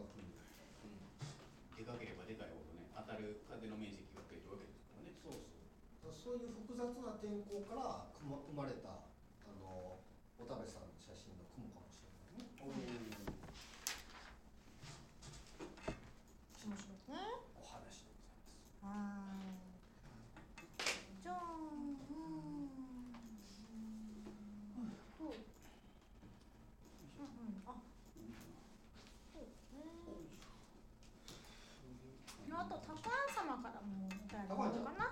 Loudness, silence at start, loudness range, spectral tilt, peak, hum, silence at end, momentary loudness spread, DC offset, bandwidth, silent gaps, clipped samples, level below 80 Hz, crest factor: -50 LUFS; 0 s; 9 LU; -4.5 dB/octave; -20 dBFS; none; 0 s; 16 LU; under 0.1%; 16.5 kHz; none; under 0.1%; -66 dBFS; 30 dB